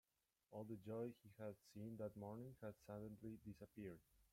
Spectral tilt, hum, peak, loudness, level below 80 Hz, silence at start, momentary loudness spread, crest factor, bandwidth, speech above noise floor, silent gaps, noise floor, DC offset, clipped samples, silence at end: -8 dB/octave; none; -40 dBFS; -56 LUFS; -80 dBFS; 0.5 s; 7 LU; 16 dB; 16.5 kHz; 28 dB; none; -83 dBFS; under 0.1%; under 0.1%; 0.05 s